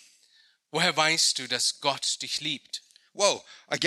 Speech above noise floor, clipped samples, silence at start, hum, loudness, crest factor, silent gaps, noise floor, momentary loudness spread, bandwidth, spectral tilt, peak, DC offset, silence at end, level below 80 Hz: 35 dB; under 0.1%; 0.75 s; none; -26 LUFS; 22 dB; none; -63 dBFS; 13 LU; 15 kHz; -1 dB/octave; -8 dBFS; under 0.1%; 0 s; -80 dBFS